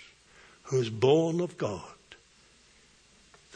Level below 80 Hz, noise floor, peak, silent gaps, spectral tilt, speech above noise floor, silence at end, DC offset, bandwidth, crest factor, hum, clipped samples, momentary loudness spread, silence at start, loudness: -68 dBFS; -61 dBFS; -10 dBFS; none; -6.5 dB/octave; 34 dB; 1.65 s; under 0.1%; 10 kHz; 22 dB; none; under 0.1%; 21 LU; 0 s; -28 LUFS